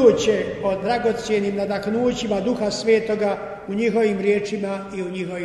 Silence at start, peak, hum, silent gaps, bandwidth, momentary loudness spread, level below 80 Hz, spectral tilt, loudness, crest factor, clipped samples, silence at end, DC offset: 0 s; -2 dBFS; none; none; 11.5 kHz; 8 LU; -50 dBFS; -5.5 dB/octave; -22 LUFS; 18 dB; under 0.1%; 0 s; under 0.1%